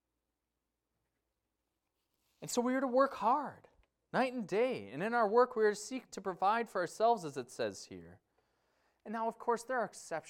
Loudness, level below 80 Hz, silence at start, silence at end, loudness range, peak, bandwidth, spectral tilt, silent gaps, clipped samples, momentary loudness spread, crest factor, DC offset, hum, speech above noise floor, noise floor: -34 LUFS; -80 dBFS; 2.4 s; 0 s; 5 LU; -16 dBFS; 16 kHz; -4.5 dB/octave; none; under 0.1%; 13 LU; 20 dB; under 0.1%; none; 54 dB; -88 dBFS